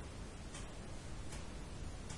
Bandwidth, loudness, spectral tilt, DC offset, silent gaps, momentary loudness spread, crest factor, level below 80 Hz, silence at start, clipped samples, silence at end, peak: 11.5 kHz; -50 LUFS; -4.5 dB/octave; under 0.1%; none; 1 LU; 14 dB; -52 dBFS; 0 s; under 0.1%; 0 s; -32 dBFS